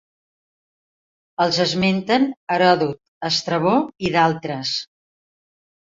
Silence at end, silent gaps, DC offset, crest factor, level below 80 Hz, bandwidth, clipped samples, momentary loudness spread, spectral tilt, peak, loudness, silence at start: 1.1 s; 2.37-2.47 s, 3.08-3.21 s; under 0.1%; 20 dB; -58 dBFS; 7.8 kHz; under 0.1%; 9 LU; -5 dB/octave; -2 dBFS; -20 LUFS; 1.4 s